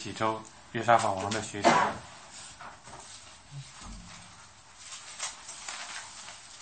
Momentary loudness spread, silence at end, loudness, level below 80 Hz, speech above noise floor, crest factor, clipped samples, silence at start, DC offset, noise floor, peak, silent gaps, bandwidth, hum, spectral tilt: 22 LU; 0 s; -30 LUFS; -60 dBFS; 25 dB; 26 dB; under 0.1%; 0 s; under 0.1%; -53 dBFS; -6 dBFS; none; 8.8 kHz; none; -3.5 dB/octave